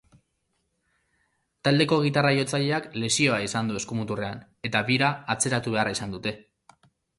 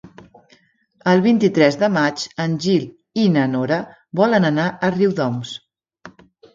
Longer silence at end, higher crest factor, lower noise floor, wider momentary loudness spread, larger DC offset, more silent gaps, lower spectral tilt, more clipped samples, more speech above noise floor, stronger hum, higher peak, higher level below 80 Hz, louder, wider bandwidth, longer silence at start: first, 0.75 s vs 0.45 s; about the same, 20 dB vs 18 dB; first, -75 dBFS vs -57 dBFS; about the same, 10 LU vs 10 LU; neither; neither; second, -4 dB/octave vs -6.5 dB/octave; neither; first, 50 dB vs 40 dB; neither; second, -8 dBFS vs 0 dBFS; about the same, -60 dBFS vs -60 dBFS; second, -25 LUFS vs -18 LUFS; first, 11.5 kHz vs 7.6 kHz; first, 1.65 s vs 0.05 s